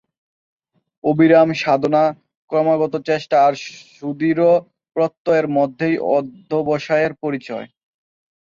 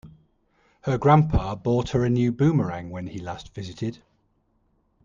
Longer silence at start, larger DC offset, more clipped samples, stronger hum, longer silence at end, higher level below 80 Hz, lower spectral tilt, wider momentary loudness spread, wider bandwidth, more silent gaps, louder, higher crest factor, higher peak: first, 1.05 s vs 0.05 s; neither; neither; neither; second, 0.8 s vs 1.1 s; second, -64 dBFS vs -40 dBFS; about the same, -7 dB/octave vs -8 dB/octave; second, 13 LU vs 16 LU; about the same, 7.4 kHz vs 7.4 kHz; first, 2.35-2.48 s, 5.17-5.25 s vs none; first, -18 LUFS vs -24 LUFS; about the same, 18 dB vs 20 dB; first, 0 dBFS vs -4 dBFS